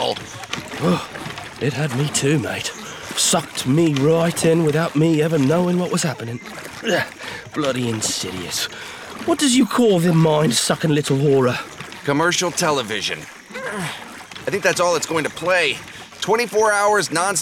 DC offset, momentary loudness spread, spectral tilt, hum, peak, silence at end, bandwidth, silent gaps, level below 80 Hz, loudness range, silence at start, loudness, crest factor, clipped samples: under 0.1%; 14 LU; -4 dB/octave; none; -4 dBFS; 0 s; 17 kHz; none; -56 dBFS; 5 LU; 0 s; -19 LUFS; 16 dB; under 0.1%